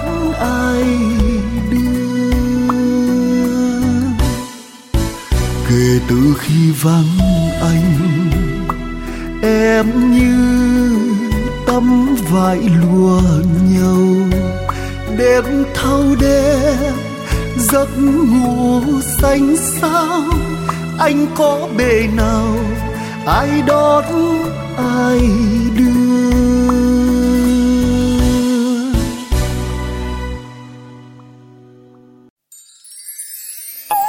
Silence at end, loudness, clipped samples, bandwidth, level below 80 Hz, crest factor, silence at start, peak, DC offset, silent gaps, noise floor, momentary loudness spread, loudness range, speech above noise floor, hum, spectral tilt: 0 s; -14 LUFS; under 0.1%; 16.5 kHz; -24 dBFS; 12 dB; 0 s; 0 dBFS; under 0.1%; 32.30-32.36 s; -43 dBFS; 10 LU; 5 LU; 31 dB; none; -6 dB/octave